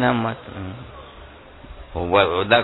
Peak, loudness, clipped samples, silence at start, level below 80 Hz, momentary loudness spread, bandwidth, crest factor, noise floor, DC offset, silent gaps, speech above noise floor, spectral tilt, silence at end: -2 dBFS; -21 LUFS; under 0.1%; 0 s; -44 dBFS; 25 LU; 4.1 kHz; 20 dB; -42 dBFS; under 0.1%; none; 22 dB; -8.5 dB/octave; 0 s